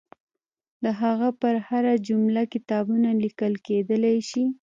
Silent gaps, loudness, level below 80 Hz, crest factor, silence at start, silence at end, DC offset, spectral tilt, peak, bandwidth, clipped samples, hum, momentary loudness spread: none; -24 LUFS; -74 dBFS; 14 dB; 0.8 s; 0.15 s; under 0.1%; -7 dB/octave; -10 dBFS; 7.6 kHz; under 0.1%; none; 4 LU